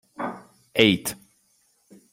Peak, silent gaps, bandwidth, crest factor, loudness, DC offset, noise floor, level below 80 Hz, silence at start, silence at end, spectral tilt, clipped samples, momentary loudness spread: -2 dBFS; none; 16 kHz; 24 dB; -23 LUFS; under 0.1%; -65 dBFS; -60 dBFS; 0.2 s; 1 s; -4 dB/octave; under 0.1%; 23 LU